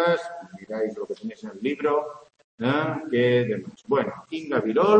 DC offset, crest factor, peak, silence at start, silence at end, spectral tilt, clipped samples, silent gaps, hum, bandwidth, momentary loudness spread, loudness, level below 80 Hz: under 0.1%; 20 dB; -4 dBFS; 0 s; 0 s; -7 dB/octave; under 0.1%; 2.44-2.58 s; none; 8.6 kHz; 13 LU; -26 LUFS; -70 dBFS